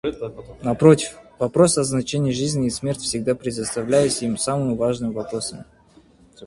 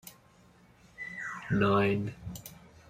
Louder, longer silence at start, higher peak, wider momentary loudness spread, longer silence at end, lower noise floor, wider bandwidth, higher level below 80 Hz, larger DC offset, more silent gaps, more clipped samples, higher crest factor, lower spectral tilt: first, -21 LUFS vs -30 LUFS; about the same, 0.05 s vs 0.05 s; first, 0 dBFS vs -14 dBFS; second, 12 LU vs 20 LU; second, 0 s vs 0.2 s; second, -52 dBFS vs -60 dBFS; second, 11.5 kHz vs 16 kHz; first, -50 dBFS vs -58 dBFS; neither; neither; neither; about the same, 20 dB vs 18 dB; second, -5 dB/octave vs -6.5 dB/octave